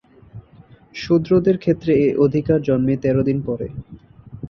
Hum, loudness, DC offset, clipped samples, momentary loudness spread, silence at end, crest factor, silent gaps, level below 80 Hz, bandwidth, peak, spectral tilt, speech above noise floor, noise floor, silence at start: none; -18 LUFS; under 0.1%; under 0.1%; 15 LU; 0 s; 16 dB; none; -46 dBFS; 6.8 kHz; -4 dBFS; -9 dB/octave; 30 dB; -47 dBFS; 0.35 s